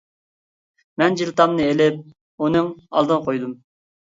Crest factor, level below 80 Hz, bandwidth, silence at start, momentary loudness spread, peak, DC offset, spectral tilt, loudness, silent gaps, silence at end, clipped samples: 20 dB; -58 dBFS; 7.8 kHz; 1 s; 15 LU; 0 dBFS; under 0.1%; -6 dB/octave; -20 LUFS; 2.21-2.38 s; 0.5 s; under 0.1%